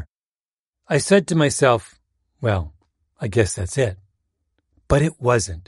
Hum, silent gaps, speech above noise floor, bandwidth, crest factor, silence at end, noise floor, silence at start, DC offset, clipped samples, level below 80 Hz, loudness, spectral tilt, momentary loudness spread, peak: none; 0.09-0.35 s, 0.42-0.73 s; over 71 dB; 11.5 kHz; 20 dB; 0.05 s; under -90 dBFS; 0 s; under 0.1%; under 0.1%; -40 dBFS; -20 LUFS; -5 dB/octave; 9 LU; -2 dBFS